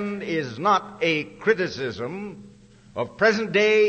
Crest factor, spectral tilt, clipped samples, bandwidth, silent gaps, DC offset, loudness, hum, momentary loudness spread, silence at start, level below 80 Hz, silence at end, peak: 18 dB; -5 dB/octave; under 0.1%; 8.4 kHz; none; under 0.1%; -23 LUFS; none; 12 LU; 0 s; -60 dBFS; 0 s; -6 dBFS